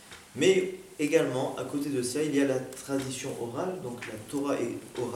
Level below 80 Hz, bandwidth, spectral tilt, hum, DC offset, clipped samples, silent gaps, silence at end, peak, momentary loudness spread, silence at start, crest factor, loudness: -68 dBFS; 16.5 kHz; -4.5 dB/octave; none; under 0.1%; under 0.1%; none; 0 s; -10 dBFS; 11 LU; 0 s; 20 dB; -30 LUFS